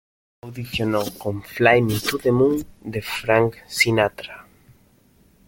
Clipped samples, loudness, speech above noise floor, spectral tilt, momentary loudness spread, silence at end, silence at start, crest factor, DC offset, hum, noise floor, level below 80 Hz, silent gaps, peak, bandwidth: under 0.1%; -21 LUFS; 36 dB; -5 dB/octave; 14 LU; 1.05 s; 0.45 s; 20 dB; under 0.1%; none; -57 dBFS; -50 dBFS; none; -2 dBFS; 17 kHz